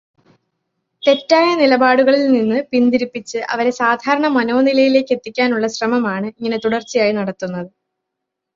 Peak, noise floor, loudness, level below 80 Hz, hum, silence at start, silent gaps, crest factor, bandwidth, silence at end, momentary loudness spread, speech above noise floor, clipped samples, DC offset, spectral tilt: 0 dBFS; -79 dBFS; -16 LUFS; -62 dBFS; none; 1.05 s; none; 16 dB; 7.6 kHz; 0.9 s; 10 LU; 64 dB; under 0.1%; under 0.1%; -5 dB/octave